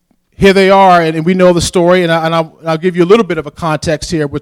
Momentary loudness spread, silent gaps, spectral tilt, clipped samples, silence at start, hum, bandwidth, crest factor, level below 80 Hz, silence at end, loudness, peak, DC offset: 10 LU; none; -5.5 dB/octave; 0.8%; 0.4 s; none; 15.5 kHz; 10 dB; -36 dBFS; 0 s; -10 LUFS; 0 dBFS; under 0.1%